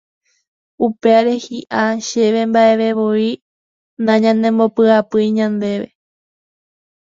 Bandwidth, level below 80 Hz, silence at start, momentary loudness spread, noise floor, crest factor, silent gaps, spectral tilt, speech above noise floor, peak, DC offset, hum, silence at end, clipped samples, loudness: 7.6 kHz; -62 dBFS; 0.8 s; 9 LU; under -90 dBFS; 16 dB; 3.42-3.97 s; -5.5 dB/octave; over 76 dB; 0 dBFS; under 0.1%; none; 1.2 s; under 0.1%; -15 LUFS